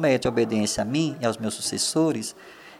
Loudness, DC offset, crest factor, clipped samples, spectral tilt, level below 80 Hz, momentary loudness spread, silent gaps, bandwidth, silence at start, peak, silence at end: -24 LUFS; under 0.1%; 16 dB; under 0.1%; -4 dB/octave; -56 dBFS; 8 LU; none; 15.5 kHz; 0 s; -8 dBFS; 0 s